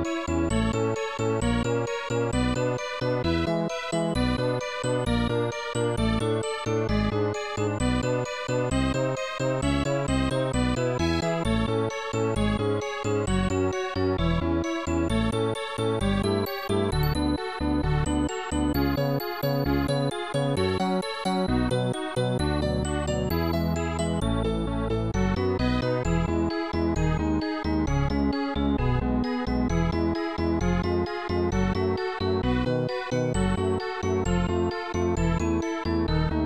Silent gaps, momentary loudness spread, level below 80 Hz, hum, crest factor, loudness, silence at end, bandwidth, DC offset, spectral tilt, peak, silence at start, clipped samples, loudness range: none; 3 LU; -34 dBFS; none; 14 dB; -26 LUFS; 0 s; 13 kHz; 0.2%; -6 dB/octave; -12 dBFS; 0 s; under 0.1%; 1 LU